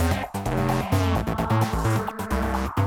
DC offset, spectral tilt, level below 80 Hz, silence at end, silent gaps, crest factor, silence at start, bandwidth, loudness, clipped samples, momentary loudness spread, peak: under 0.1%; -6.5 dB/octave; -34 dBFS; 0 s; none; 16 dB; 0 s; 18.5 kHz; -25 LUFS; under 0.1%; 4 LU; -8 dBFS